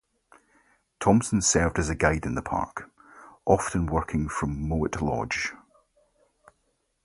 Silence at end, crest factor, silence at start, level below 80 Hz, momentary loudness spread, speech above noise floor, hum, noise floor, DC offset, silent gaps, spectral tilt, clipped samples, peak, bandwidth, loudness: 1.5 s; 24 dB; 1 s; -40 dBFS; 9 LU; 48 dB; none; -73 dBFS; under 0.1%; none; -5 dB/octave; under 0.1%; -4 dBFS; 11.5 kHz; -26 LUFS